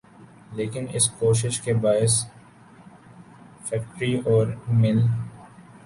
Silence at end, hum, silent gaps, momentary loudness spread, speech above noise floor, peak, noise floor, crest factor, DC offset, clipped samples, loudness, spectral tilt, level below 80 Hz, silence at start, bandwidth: 0.25 s; none; none; 12 LU; 27 dB; -8 dBFS; -49 dBFS; 16 dB; under 0.1%; under 0.1%; -23 LUFS; -5 dB/octave; -54 dBFS; 0.2 s; 11.5 kHz